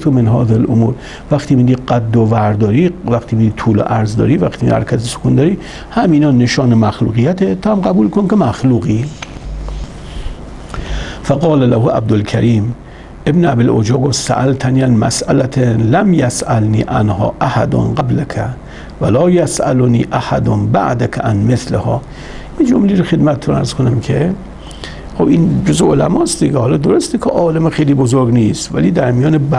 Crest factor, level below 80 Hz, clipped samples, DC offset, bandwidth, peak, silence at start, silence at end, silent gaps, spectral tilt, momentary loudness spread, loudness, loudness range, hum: 12 dB; -32 dBFS; under 0.1%; under 0.1%; 11.5 kHz; 0 dBFS; 0 s; 0 s; none; -7 dB/octave; 12 LU; -13 LUFS; 3 LU; none